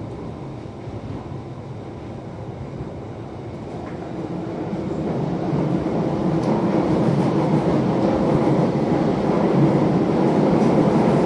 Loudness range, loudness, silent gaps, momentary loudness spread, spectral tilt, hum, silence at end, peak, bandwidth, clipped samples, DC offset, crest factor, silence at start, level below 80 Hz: 14 LU; -20 LUFS; none; 16 LU; -8.5 dB/octave; none; 0 s; -4 dBFS; 10.5 kHz; under 0.1%; under 0.1%; 16 dB; 0 s; -44 dBFS